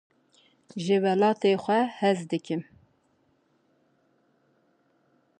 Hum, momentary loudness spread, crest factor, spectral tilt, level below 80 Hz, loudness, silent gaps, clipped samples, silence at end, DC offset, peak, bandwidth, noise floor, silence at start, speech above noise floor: none; 12 LU; 18 dB; -6 dB/octave; -78 dBFS; -26 LUFS; none; under 0.1%; 2.75 s; under 0.1%; -10 dBFS; 9.6 kHz; -68 dBFS; 0.75 s; 44 dB